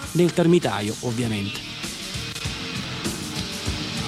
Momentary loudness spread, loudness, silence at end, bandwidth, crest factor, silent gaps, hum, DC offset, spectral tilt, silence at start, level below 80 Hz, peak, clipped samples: 10 LU; -25 LUFS; 0 s; 15.5 kHz; 18 dB; none; none; under 0.1%; -5 dB/octave; 0 s; -44 dBFS; -6 dBFS; under 0.1%